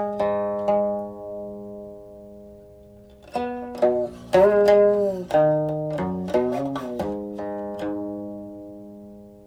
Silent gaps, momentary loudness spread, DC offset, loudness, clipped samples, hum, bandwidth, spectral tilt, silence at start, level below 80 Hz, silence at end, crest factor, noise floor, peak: none; 23 LU; under 0.1%; -23 LUFS; under 0.1%; none; 13 kHz; -7.5 dB/octave; 0 s; -54 dBFS; 0.05 s; 18 dB; -47 dBFS; -6 dBFS